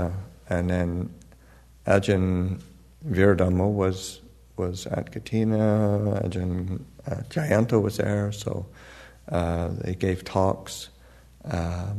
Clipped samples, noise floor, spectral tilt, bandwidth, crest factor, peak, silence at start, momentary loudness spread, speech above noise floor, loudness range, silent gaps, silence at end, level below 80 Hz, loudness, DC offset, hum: under 0.1%; -52 dBFS; -7 dB/octave; 13.5 kHz; 20 dB; -4 dBFS; 0 s; 16 LU; 27 dB; 4 LU; none; 0 s; -46 dBFS; -26 LUFS; under 0.1%; none